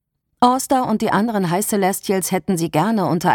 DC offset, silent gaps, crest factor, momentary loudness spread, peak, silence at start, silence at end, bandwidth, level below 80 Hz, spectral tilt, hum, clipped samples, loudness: under 0.1%; none; 18 dB; 3 LU; -2 dBFS; 0.4 s; 0 s; 19 kHz; -56 dBFS; -5 dB/octave; none; under 0.1%; -18 LUFS